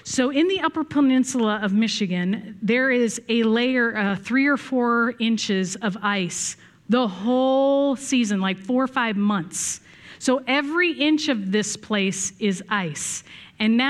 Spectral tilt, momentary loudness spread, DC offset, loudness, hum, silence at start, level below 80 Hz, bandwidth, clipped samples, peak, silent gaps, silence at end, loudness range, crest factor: -4 dB/octave; 7 LU; under 0.1%; -22 LUFS; none; 0.05 s; -66 dBFS; 13 kHz; under 0.1%; -6 dBFS; none; 0 s; 2 LU; 16 dB